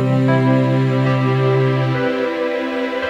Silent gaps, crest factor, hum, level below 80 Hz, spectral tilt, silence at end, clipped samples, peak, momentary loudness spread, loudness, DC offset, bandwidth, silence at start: none; 12 dB; none; -56 dBFS; -8.5 dB/octave; 0 s; under 0.1%; -4 dBFS; 6 LU; -17 LUFS; under 0.1%; 7.4 kHz; 0 s